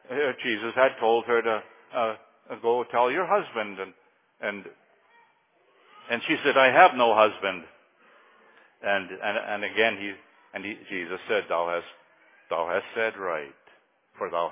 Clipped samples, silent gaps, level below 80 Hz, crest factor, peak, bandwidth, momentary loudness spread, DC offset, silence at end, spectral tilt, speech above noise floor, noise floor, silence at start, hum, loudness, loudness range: under 0.1%; none; -74 dBFS; 24 dB; -2 dBFS; 3.8 kHz; 16 LU; under 0.1%; 0 s; -7.5 dB/octave; 39 dB; -65 dBFS; 0.1 s; none; -25 LUFS; 7 LU